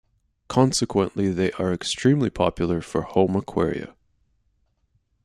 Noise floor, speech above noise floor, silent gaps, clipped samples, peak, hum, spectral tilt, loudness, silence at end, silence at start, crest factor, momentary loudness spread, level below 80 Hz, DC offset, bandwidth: -68 dBFS; 46 dB; none; under 0.1%; -4 dBFS; none; -5.5 dB/octave; -23 LUFS; 1.35 s; 0.5 s; 20 dB; 6 LU; -50 dBFS; under 0.1%; 13 kHz